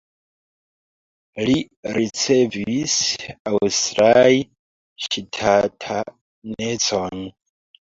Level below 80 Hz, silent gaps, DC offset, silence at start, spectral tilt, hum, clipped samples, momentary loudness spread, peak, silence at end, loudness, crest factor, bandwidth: -54 dBFS; 1.77-1.83 s, 3.40-3.45 s, 4.59-4.96 s, 6.21-6.42 s; under 0.1%; 1.35 s; -3.5 dB/octave; none; under 0.1%; 19 LU; -2 dBFS; 0.5 s; -19 LUFS; 18 dB; 7.8 kHz